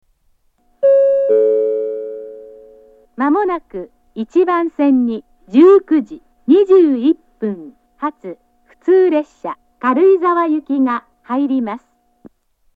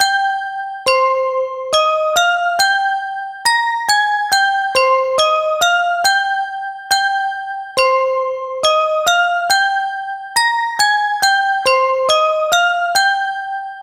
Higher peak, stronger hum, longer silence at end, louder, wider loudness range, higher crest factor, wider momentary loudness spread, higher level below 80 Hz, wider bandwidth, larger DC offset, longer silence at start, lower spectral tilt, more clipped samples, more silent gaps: about the same, 0 dBFS vs 0 dBFS; neither; first, 1 s vs 0 s; about the same, -15 LUFS vs -15 LUFS; first, 5 LU vs 2 LU; about the same, 16 dB vs 16 dB; first, 18 LU vs 7 LU; about the same, -58 dBFS vs -58 dBFS; second, 4.8 kHz vs 16 kHz; neither; first, 0.8 s vs 0 s; first, -8 dB/octave vs 1 dB/octave; neither; neither